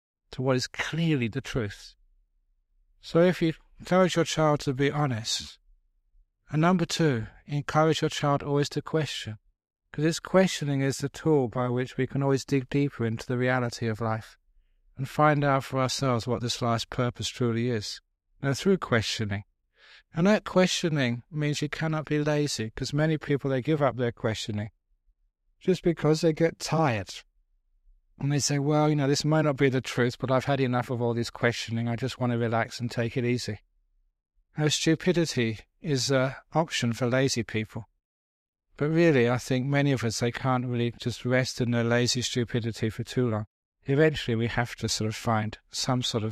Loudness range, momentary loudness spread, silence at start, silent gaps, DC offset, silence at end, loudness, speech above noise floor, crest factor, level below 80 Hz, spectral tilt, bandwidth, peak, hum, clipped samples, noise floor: 3 LU; 9 LU; 0.3 s; 38.05-38.53 s, 43.47-43.72 s; under 0.1%; 0 s; -27 LUFS; 44 dB; 20 dB; -56 dBFS; -5.5 dB/octave; 14.5 kHz; -8 dBFS; none; under 0.1%; -70 dBFS